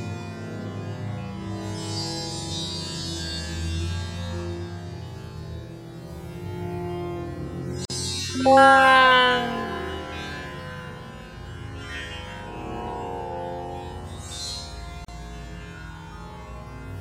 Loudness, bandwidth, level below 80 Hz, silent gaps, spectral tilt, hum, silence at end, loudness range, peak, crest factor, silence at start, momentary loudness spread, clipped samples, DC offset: -24 LUFS; 16 kHz; -44 dBFS; none; -4 dB/octave; none; 0 s; 16 LU; -2 dBFS; 24 dB; 0 s; 21 LU; under 0.1%; under 0.1%